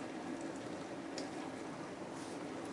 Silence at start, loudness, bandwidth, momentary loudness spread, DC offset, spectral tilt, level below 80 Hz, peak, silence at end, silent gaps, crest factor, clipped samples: 0 s; -45 LUFS; 11.5 kHz; 2 LU; under 0.1%; -4.5 dB/octave; -78 dBFS; -28 dBFS; 0 s; none; 16 dB; under 0.1%